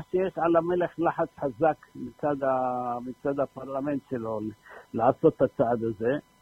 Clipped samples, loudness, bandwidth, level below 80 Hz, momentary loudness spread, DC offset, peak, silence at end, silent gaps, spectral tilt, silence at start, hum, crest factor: under 0.1%; -28 LUFS; 9.6 kHz; -60 dBFS; 10 LU; under 0.1%; -8 dBFS; 0.2 s; none; -9 dB/octave; 0 s; none; 20 dB